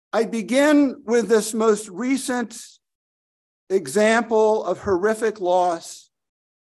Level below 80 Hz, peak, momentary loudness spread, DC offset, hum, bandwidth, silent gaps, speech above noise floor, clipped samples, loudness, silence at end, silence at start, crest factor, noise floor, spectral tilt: -58 dBFS; -4 dBFS; 9 LU; under 0.1%; none; 12.5 kHz; 2.95-3.67 s; over 70 dB; under 0.1%; -20 LUFS; 0.8 s; 0.15 s; 16 dB; under -90 dBFS; -4 dB/octave